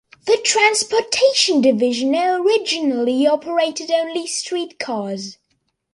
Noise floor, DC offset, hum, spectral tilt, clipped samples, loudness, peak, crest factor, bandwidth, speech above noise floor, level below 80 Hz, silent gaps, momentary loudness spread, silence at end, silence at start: -69 dBFS; under 0.1%; none; -2 dB/octave; under 0.1%; -18 LUFS; -2 dBFS; 18 dB; 11.5 kHz; 51 dB; -66 dBFS; none; 11 LU; 0.6 s; 0.25 s